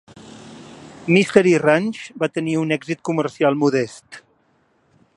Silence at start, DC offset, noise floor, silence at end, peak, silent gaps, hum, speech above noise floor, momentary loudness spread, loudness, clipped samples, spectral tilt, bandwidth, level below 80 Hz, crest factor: 0.2 s; under 0.1%; -62 dBFS; 0.95 s; 0 dBFS; none; none; 43 dB; 25 LU; -19 LUFS; under 0.1%; -6 dB/octave; 11.5 kHz; -64 dBFS; 20 dB